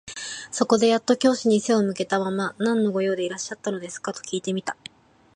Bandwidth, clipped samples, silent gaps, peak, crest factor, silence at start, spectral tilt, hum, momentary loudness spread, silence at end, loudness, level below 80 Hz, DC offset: 11 kHz; under 0.1%; none; -4 dBFS; 20 dB; 0.05 s; -4.5 dB/octave; none; 12 LU; 0.65 s; -24 LUFS; -68 dBFS; under 0.1%